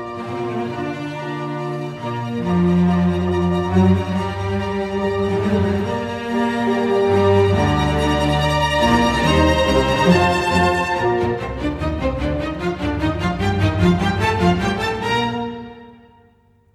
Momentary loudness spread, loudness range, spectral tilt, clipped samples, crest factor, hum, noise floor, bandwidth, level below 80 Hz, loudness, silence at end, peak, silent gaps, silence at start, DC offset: 10 LU; 4 LU; -6.5 dB/octave; under 0.1%; 16 dB; none; -54 dBFS; 14 kHz; -32 dBFS; -19 LUFS; 0.8 s; -2 dBFS; none; 0 s; under 0.1%